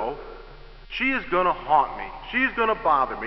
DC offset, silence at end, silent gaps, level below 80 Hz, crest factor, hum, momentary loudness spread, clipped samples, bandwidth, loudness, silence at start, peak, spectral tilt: under 0.1%; 0 s; none; -46 dBFS; 18 dB; none; 14 LU; under 0.1%; 6 kHz; -23 LUFS; 0 s; -6 dBFS; -7 dB/octave